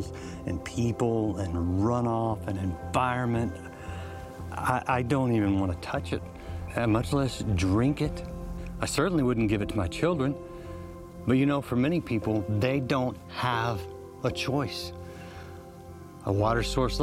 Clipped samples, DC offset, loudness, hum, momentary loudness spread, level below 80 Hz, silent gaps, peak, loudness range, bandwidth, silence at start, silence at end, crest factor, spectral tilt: under 0.1%; under 0.1%; -28 LUFS; none; 15 LU; -46 dBFS; none; -10 dBFS; 3 LU; 16 kHz; 0 s; 0 s; 18 dB; -6.5 dB/octave